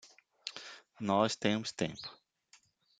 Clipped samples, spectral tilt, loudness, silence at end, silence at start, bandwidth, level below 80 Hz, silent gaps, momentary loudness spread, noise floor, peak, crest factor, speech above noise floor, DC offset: under 0.1%; -4.5 dB/octave; -35 LUFS; 0.85 s; 0.05 s; 9.4 kHz; -76 dBFS; none; 17 LU; -67 dBFS; -14 dBFS; 22 dB; 34 dB; under 0.1%